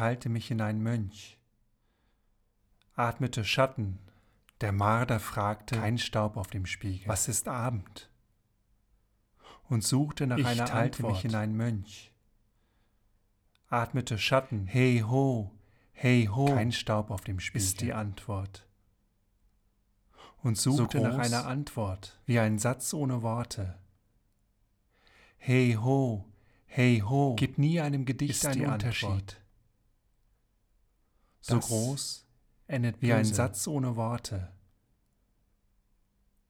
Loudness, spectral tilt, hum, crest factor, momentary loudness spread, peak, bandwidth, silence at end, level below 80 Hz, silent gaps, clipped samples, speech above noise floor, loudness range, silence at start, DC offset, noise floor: -30 LUFS; -5.5 dB/octave; none; 20 dB; 12 LU; -12 dBFS; 17.5 kHz; 1.95 s; -58 dBFS; none; under 0.1%; 42 dB; 7 LU; 0 s; under 0.1%; -71 dBFS